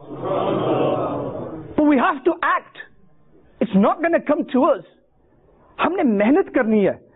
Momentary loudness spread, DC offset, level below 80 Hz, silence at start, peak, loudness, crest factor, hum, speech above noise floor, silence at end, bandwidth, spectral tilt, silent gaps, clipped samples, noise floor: 10 LU; under 0.1%; -56 dBFS; 0 s; -6 dBFS; -19 LUFS; 14 dB; none; 39 dB; 0.2 s; 4 kHz; -11.5 dB/octave; none; under 0.1%; -57 dBFS